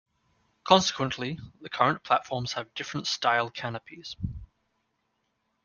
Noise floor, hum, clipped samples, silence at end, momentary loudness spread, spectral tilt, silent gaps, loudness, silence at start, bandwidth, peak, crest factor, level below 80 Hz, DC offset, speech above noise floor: -76 dBFS; none; under 0.1%; 1.2 s; 17 LU; -4 dB/octave; none; -27 LUFS; 0.65 s; 10 kHz; -4 dBFS; 26 dB; -56 dBFS; under 0.1%; 48 dB